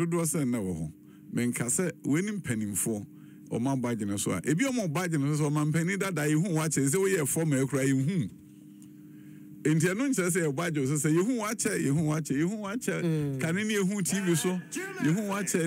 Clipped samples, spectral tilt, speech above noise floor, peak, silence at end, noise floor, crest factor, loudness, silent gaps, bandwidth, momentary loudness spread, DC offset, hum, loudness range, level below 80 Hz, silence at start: under 0.1%; -5 dB/octave; 21 dB; -14 dBFS; 0 s; -49 dBFS; 14 dB; -29 LUFS; none; 16 kHz; 7 LU; under 0.1%; none; 3 LU; -64 dBFS; 0 s